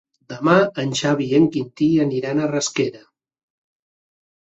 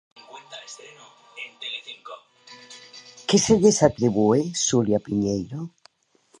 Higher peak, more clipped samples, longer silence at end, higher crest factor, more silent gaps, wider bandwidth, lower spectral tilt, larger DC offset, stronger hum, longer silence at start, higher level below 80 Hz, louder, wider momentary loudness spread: about the same, -2 dBFS vs -2 dBFS; neither; first, 1.45 s vs 0.7 s; about the same, 18 dB vs 22 dB; neither; second, 8 kHz vs 11.5 kHz; about the same, -5.5 dB/octave vs -4.5 dB/octave; neither; neither; about the same, 0.3 s vs 0.35 s; second, -60 dBFS vs -54 dBFS; first, -19 LUFS vs -22 LUFS; second, 7 LU vs 25 LU